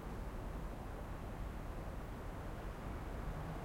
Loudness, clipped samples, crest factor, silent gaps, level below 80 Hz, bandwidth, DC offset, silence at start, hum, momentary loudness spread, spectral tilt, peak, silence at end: -47 LUFS; under 0.1%; 12 dB; none; -48 dBFS; 16.5 kHz; under 0.1%; 0 s; none; 2 LU; -7 dB/octave; -32 dBFS; 0 s